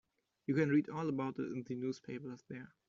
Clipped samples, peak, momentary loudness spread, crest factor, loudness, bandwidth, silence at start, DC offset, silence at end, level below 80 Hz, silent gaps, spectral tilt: under 0.1%; -20 dBFS; 16 LU; 18 dB; -38 LUFS; 7.4 kHz; 0.5 s; under 0.1%; 0.2 s; -78 dBFS; none; -7.5 dB/octave